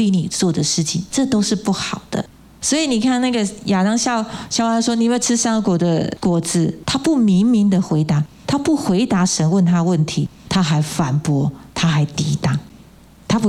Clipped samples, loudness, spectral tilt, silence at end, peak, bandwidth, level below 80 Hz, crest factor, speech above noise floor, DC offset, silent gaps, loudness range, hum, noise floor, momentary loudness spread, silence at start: under 0.1%; -18 LUFS; -5 dB/octave; 0 s; -4 dBFS; 14 kHz; -48 dBFS; 12 dB; 27 dB; under 0.1%; none; 2 LU; none; -44 dBFS; 7 LU; 0 s